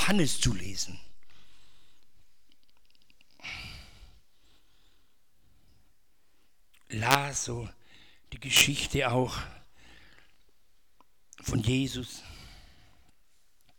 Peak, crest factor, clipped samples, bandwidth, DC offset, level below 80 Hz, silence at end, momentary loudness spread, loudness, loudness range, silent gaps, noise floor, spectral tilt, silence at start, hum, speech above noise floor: 0 dBFS; 32 dB; under 0.1%; 19.5 kHz; under 0.1%; -50 dBFS; 0 s; 23 LU; -29 LUFS; 20 LU; none; -71 dBFS; -3 dB/octave; 0 s; none; 43 dB